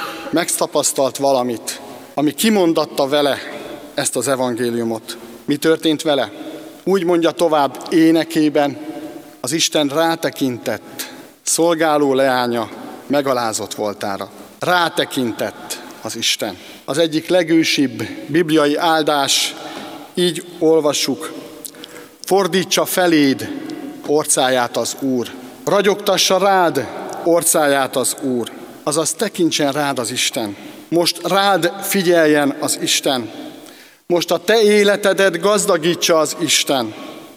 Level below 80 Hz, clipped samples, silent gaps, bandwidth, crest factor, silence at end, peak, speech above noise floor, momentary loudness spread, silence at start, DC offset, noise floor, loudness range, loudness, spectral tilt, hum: -66 dBFS; under 0.1%; none; 16.5 kHz; 18 dB; 0 s; 0 dBFS; 25 dB; 15 LU; 0 s; under 0.1%; -41 dBFS; 4 LU; -17 LUFS; -3 dB/octave; none